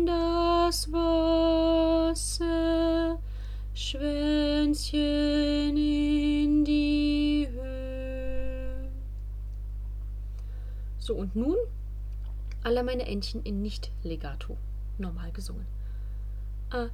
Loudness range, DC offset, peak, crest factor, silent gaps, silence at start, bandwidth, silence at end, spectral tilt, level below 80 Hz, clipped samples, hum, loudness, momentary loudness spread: 11 LU; under 0.1%; -14 dBFS; 14 dB; none; 0 s; 14 kHz; 0 s; -5.5 dB/octave; -36 dBFS; under 0.1%; 50 Hz at -35 dBFS; -28 LUFS; 15 LU